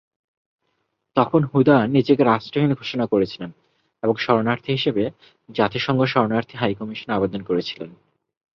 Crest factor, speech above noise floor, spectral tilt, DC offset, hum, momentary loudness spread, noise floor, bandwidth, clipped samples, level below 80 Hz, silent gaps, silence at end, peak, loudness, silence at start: 20 dB; 53 dB; -8 dB/octave; under 0.1%; none; 12 LU; -73 dBFS; 6.6 kHz; under 0.1%; -58 dBFS; none; 0.65 s; -2 dBFS; -21 LUFS; 1.15 s